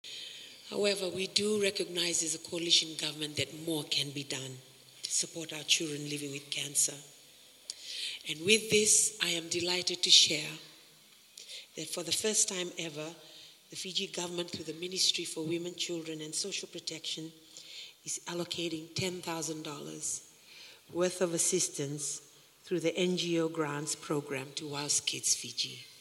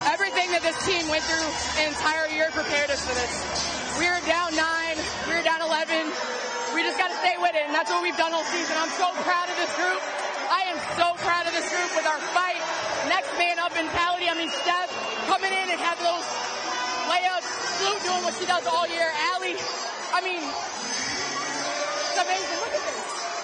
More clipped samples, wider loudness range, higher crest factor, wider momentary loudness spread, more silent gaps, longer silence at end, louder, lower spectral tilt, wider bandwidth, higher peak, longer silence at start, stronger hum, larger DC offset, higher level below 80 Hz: neither; first, 11 LU vs 2 LU; first, 26 dB vs 18 dB; first, 17 LU vs 5 LU; neither; about the same, 0 s vs 0 s; second, -31 LUFS vs -25 LUFS; about the same, -1.5 dB/octave vs -1.5 dB/octave; first, 16.5 kHz vs 10 kHz; about the same, -8 dBFS vs -8 dBFS; about the same, 0.05 s vs 0 s; neither; neither; second, -80 dBFS vs -56 dBFS